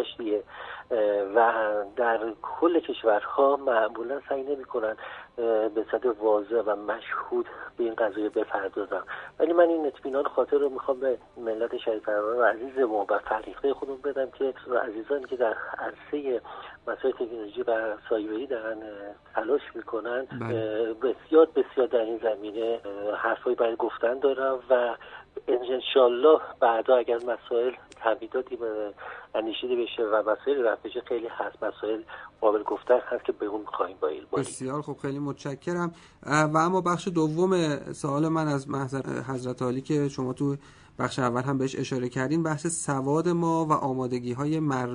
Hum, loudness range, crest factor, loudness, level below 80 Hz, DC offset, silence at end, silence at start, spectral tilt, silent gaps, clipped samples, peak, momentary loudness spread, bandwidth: none; 6 LU; 20 dB; -27 LUFS; -64 dBFS; under 0.1%; 0 s; 0 s; -6 dB/octave; none; under 0.1%; -6 dBFS; 10 LU; 10 kHz